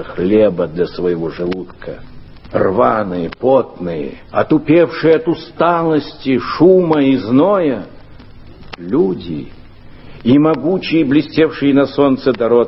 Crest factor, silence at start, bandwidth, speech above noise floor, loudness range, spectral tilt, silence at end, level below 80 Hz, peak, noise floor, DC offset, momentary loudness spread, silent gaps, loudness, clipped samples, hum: 14 dB; 0 s; 5.8 kHz; 22 dB; 5 LU; -10 dB/octave; 0 s; -42 dBFS; 0 dBFS; -36 dBFS; under 0.1%; 13 LU; none; -14 LUFS; under 0.1%; none